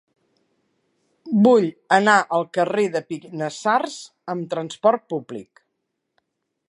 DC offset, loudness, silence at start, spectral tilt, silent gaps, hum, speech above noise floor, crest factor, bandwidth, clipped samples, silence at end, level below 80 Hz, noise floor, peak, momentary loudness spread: under 0.1%; -20 LUFS; 1.25 s; -5.5 dB/octave; none; none; 57 dB; 22 dB; 11 kHz; under 0.1%; 1.25 s; -76 dBFS; -77 dBFS; -2 dBFS; 15 LU